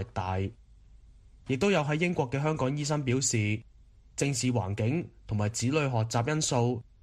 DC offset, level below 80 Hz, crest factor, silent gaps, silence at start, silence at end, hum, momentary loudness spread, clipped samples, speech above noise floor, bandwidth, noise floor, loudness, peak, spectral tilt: under 0.1%; -54 dBFS; 16 dB; none; 0 s; 0.2 s; none; 8 LU; under 0.1%; 26 dB; 13.5 kHz; -54 dBFS; -29 LUFS; -14 dBFS; -5 dB/octave